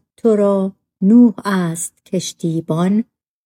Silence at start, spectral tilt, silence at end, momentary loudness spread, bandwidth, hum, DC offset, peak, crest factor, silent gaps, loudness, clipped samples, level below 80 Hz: 0.25 s; -6.5 dB/octave; 0.45 s; 12 LU; 16.5 kHz; none; under 0.1%; -2 dBFS; 14 dB; none; -16 LUFS; under 0.1%; -66 dBFS